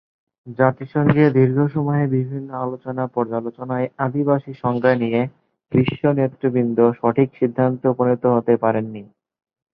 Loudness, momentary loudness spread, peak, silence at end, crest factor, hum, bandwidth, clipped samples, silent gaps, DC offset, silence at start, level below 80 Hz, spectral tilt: -19 LUFS; 10 LU; -2 dBFS; 0.7 s; 18 dB; none; 5.4 kHz; under 0.1%; none; under 0.1%; 0.45 s; -56 dBFS; -11.5 dB/octave